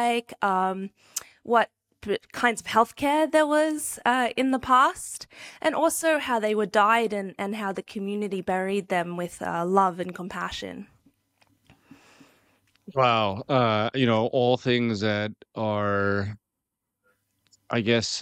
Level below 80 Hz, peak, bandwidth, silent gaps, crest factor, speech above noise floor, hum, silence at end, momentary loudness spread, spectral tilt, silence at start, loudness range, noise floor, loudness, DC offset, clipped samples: -62 dBFS; -6 dBFS; 17 kHz; none; 20 dB; 59 dB; none; 0 s; 13 LU; -4.5 dB/octave; 0 s; 6 LU; -84 dBFS; -25 LUFS; under 0.1%; under 0.1%